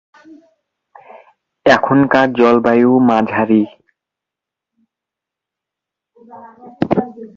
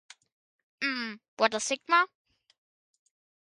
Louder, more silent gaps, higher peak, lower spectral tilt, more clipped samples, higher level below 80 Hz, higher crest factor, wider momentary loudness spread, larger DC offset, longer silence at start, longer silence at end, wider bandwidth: first, -13 LUFS vs -29 LUFS; second, none vs 1.28-1.37 s; first, 0 dBFS vs -8 dBFS; first, -7 dB/octave vs -1 dB/octave; neither; first, -54 dBFS vs -82 dBFS; second, 16 dB vs 24 dB; about the same, 7 LU vs 9 LU; neither; first, 1.65 s vs 0.8 s; second, 0.1 s vs 1.35 s; second, 7.2 kHz vs 11.5 kHz